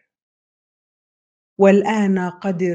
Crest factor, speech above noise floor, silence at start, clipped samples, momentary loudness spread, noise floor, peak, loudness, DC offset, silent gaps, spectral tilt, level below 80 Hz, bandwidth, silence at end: 20 dB; over 74 dB; 1.6 s; under 0.1%; 8 LU; under -90 dBFS; 0 dBFS; -17 LUFS; under 0.1%; none; -7.5 dB/octave; -66 dBFS; 7.8 kHz; 0 s